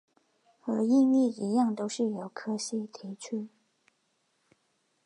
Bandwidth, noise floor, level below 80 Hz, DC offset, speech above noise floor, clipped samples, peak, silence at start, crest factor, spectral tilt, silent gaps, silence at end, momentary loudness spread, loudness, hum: 11 kHz; -75 dBFS; -84 dBFS; under 0.1%; 46 dB; under 0.1%; -16 dBFS; 0.65 s; 16 dB; -5.5 dB/octave; none; 1.6 s; 17 LU; -29 LUFS; none